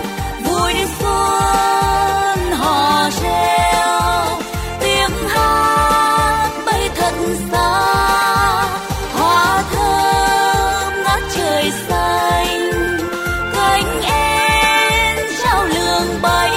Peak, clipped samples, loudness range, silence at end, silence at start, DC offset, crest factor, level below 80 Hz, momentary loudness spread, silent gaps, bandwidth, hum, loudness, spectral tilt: -4 dBFS; under 0.1%; 1 LU; 0 s; 0 s; under 0.1%; 12 dB; -30 dBFS; 5 LU; none; 16.5 kHz; none; -15 LUFS; -3.5 dB/octave